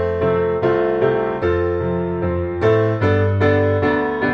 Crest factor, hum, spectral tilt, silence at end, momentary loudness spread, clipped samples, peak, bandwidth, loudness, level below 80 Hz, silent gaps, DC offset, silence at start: 14 dB; none; -9 dB/octave; 0 s; 5 LU; under 0.1%; -4 dBFS; 6.2 kHz; -18 LUFS; -40 dBFS; none; under 0.1%; 0 s